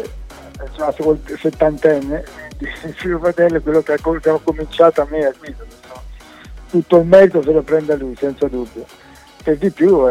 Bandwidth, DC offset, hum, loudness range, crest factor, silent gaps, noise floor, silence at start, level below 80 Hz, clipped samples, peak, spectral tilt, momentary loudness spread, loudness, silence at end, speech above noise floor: 13.5 kHz; under 0.1%; none; 3 LU; 16 dB; none; -36 dBFS; 0 s; -36 dBFS; under 0.1%; 0 dBFS; -7.5 dB/octave; 21 LU; -15 LUFS; 0 s; 21 dB